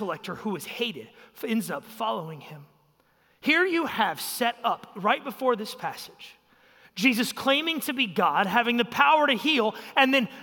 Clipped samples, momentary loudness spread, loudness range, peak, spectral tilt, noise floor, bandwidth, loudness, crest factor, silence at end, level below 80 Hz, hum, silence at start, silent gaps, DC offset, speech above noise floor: under 0.1%; 14 LU; 6 LU; -6 dBFS; -3.5 dB/octave; -65 dBFS; 17 kHz; -25 LUFS; 20 dB; 0 s; -74 dBFS; none; 0 s; none; under 0.1%; 39 dB